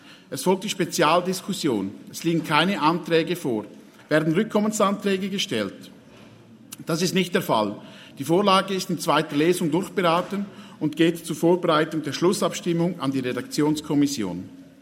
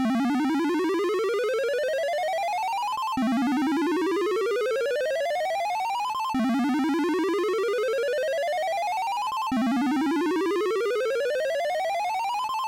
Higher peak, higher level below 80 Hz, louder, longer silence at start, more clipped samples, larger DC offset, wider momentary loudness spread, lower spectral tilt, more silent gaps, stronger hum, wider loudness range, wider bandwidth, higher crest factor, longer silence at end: first, -2 dBFS vs -22 dBFS; about the same, -68 dBFS vs -66 dBFS; first, -23 LUFS vs -26 LUFS; about the same, 0.05 s vs 0 s; neither; neither; first, 11 LU vs 3 LU; about the same, -5 dB/octave vs -4 dB/octave; neither; neither; first, 3 LU vs 0 LU; about the same, 16.5 kHz vs 17 kHz; first, 22 dB vs 4 dB; first, 0.2 s vs 0 s